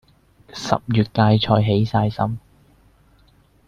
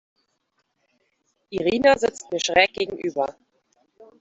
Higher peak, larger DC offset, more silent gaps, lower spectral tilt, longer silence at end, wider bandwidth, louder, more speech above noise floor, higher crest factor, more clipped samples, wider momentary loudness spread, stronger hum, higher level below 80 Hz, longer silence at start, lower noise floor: about the same, -2 dBFS vs -4 dBFS; neither; neither; first, -7 dB/octave vs -3 dB/octave; first, 1.3 s vs 0.15 s; about the same, 7.4 kHz vs 8 kHz; first, -19 LUFS vs -22 LUFS; second, 37 dB vs 51 dB; about the same, 18 dB vs 22 dB; neither; first, 14 LU vs 10 LU; neither; first, -48 dBFS vs -58 dBFS; second, 0.55 s vs 1.5 s; second, -55 dBFS vs -73 dBFS